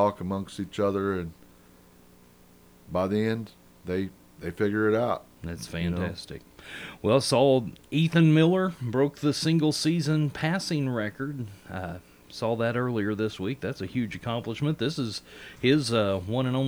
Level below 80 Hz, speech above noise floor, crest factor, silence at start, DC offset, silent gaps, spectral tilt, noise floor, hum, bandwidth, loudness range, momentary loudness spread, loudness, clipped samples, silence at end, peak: -56 dBFS; 29 dB; 20 dB; 0 s; under 0.1%; none; -6 dB/octave; -55 dBFS; none; over 20 kHz; 8 LU; 17 LU; -27 LUFS; under 0.1%; 0 s; -8 dBFS